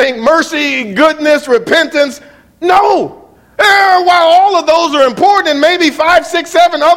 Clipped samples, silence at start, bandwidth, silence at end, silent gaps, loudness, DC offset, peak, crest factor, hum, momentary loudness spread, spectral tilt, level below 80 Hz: 0.4%; 0 s; 16.5 kHz; 0 s; none; -9 LUFS; under 0.1%; 0 dBFS; 10 dB; none; 6 LU; -2.5 dB/octave; -50 dBFS